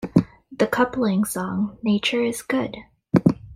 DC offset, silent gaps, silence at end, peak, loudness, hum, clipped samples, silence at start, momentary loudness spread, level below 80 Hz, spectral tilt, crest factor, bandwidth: under 0.1%; none; 0 s; -2 dBFS; -22 LUFS; none; under 0.1%; 0 s; 6 LU; -52 dBFS; -5.5 dB/octave; 20 dB; 16 kHz